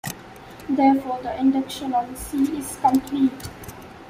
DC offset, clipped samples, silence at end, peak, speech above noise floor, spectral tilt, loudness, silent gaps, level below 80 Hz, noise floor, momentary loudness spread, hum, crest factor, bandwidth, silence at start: under 0.1%; under 0.1%; 0 s; -6 dBFS; 20 dB; -5 dB/octave; -22 LUFS; none; -50 dBFS; -41 dBFS; 19 LU; none; 16 dB; 16 kHz; 0.05 s